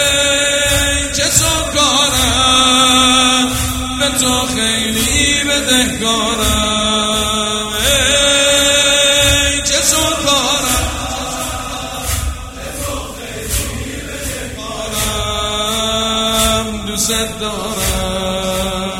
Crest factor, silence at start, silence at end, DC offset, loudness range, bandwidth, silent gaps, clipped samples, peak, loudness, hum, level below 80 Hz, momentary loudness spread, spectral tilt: 14 dB; 0 s; 0 s; under 0.1%; 10 LU; 16.5 kHz; none; under 0.1%; 0 dBFS; -13 LUFS; none; -28 dBFS; 13 LU; -2 dB/octave